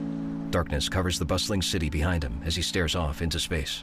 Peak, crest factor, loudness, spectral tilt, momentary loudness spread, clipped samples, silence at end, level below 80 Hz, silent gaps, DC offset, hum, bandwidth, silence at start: -14 dBFS; 14 dB; -28 LUFS; -4.5 dB/octave; 4 LU; under 0.1%; 0 s; -38 dBFS; none; under 0.1%; none; 16 kHz; 0 s